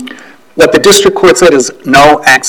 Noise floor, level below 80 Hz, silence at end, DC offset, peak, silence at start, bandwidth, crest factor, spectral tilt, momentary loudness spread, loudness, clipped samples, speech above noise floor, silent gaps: -31 dBFS; -36 dBFS; 0 s; under 0.1%; 0 dBFS; 0 s; over 20 kHz; 6 dB; -3 dB/octave; 8 LU; -5 LUFS; 6%; 25 dB; none